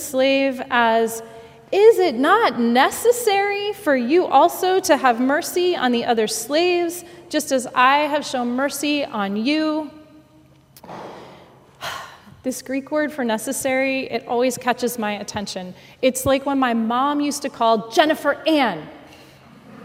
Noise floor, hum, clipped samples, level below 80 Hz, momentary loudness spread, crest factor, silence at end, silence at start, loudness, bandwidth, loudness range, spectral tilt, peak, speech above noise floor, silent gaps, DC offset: -51 dBFS; none; under 0.1%; -58 dBFS; 15 LU; 20 dB; 0 s; 0 s; -19 LUFS; 16.5 kHz; 9 LU; -3 dB/octave; 0 dBFS; 32 dB; none; under 0.1%